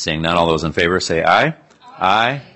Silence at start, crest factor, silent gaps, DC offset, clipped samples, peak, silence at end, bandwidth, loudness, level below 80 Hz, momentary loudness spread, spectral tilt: 0 s; 16 dB; none; under 0.1%; under 0.1%; 0 dBFS; 0.15 s; 8.8 kHz; -16 LUFS; -44 dBFS; 3 LU; -4.5 dB/octave